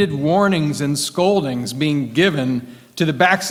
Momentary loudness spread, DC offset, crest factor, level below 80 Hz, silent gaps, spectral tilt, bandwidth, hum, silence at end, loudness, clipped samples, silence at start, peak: 7 LU; under 0.1%; 18 dB; -54 dBFS; none; -5 dB/octave; 16.5 kHz; none; 0 s; -18 LUFS; under 0.1%; 0 s; 0 dBFS